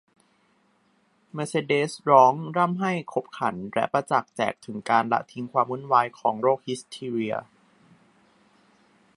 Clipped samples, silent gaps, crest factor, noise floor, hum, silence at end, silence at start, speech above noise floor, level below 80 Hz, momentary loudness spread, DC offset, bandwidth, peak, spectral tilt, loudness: under 0.1%; none; 24 dB; -66 dBFS; none; 1.75 s; 1.35 s; 41 dB; -72 dBFS; 12 LU; under 0.1%; 11.5 kHz; -2 dBFS; -5.5 dB/octave; -25 LUFS